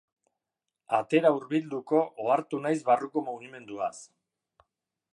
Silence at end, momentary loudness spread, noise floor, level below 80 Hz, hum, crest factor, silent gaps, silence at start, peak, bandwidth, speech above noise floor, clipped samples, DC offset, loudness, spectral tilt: 1.1 s; 13 LU; -87 dBFS; -82 dBFS; none; 20 dB; none; 0.9 s; -10 dBFS; 11 kHz; 60 dB; under 0.1%; under 0.1%; -28 LUFS; -6 dB/octave